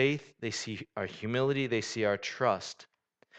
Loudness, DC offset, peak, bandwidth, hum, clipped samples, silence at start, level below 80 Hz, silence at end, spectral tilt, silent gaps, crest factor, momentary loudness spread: -32 LUFS; under 0.1%; -14 dBFS; 9 kHz; none; under 0.1%; 0 s; -70 dBFS; 0 s; -4.5 dB/octave; none; 20 dB; 9 LU